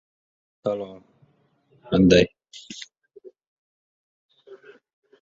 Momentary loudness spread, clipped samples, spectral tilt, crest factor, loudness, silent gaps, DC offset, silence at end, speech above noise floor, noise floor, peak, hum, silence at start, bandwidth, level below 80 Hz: 24 LU; under 0.1%; -6 dB/octave; 24 dB; -21 LUFS; 3.47-4.29 s; under 0.1%; 0.65 s; 43 dB; -64 dBFS; -2 dBFS; none; 0.65 s; 7.8 kHz; -50 dBFS